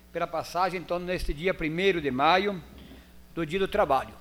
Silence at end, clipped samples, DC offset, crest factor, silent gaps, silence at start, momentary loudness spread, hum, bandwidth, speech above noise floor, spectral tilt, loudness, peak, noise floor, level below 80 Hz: 0 s; under 0.1%; under 0.1%; 20 dB; none; 0.15 s; 11 LU; none; 16.5 kHz; 22 dB; -5.5 dB/octave; -27 LUFS; -8 dBFS; -49 dBFS; -44 dBFS